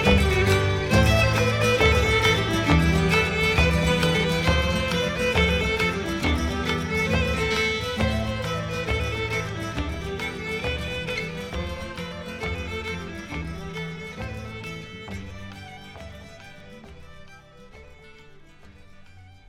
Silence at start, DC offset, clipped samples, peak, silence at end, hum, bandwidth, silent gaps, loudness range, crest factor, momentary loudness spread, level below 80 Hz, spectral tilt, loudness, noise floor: 0 s; under 0.1%; under 0.1%; -6 dBFS; 0.1 s; none; 16 kHz; none; 18 LU; 20 dB; 17 LU; -34 dBFS; -5 dB/octave; -23 LUFS; -47 dBFS